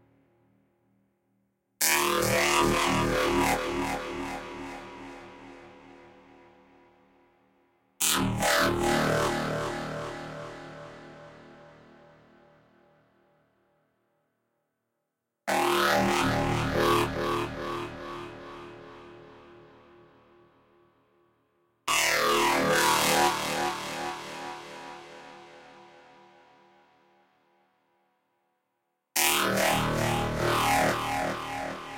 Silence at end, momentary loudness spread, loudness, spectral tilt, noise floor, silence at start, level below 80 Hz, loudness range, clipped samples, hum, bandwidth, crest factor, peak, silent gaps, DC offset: 0 s; 22 LU; -26 LUFS; -3 dB/octave; -83 dBFS; 1.8 s; -50 dBFS; 19 LU; under 0.1%; none; 16 kHz; 26 dB; -4 dBFS; none; under 0.1%